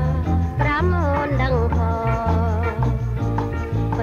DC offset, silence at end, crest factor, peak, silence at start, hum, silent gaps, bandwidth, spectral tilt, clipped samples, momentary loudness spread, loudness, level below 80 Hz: under 0.1%; 0 s; 14 dB; -6 dBFS; 0 s; none; none; 7 kHz; -8.5 dB/octave; under 0.1%; 4 LU; -21 LUFS; -26 dBFS